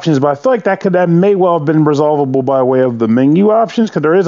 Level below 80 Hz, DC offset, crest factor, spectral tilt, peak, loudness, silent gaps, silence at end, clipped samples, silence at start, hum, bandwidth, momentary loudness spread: -64 dBFS; under 0.1%; 10 dB; -8 dB/octave; 0 dBFS; -11 LUFS; none; 0 s; under 0.1%; 0 s; none; 7.4 kHz; 3 LU